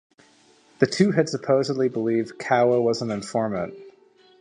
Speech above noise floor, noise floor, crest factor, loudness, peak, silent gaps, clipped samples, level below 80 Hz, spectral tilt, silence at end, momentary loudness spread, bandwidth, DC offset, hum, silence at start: 35 dB; -57 dBFS; 20 dB; -23 LUFS; -2 dBFS; none; under 0.1%; -64 dBFS; -6 dB/octave; 0.5 s; 7 LU; 10.5 kHz; under 0.1%; none; 0.8 s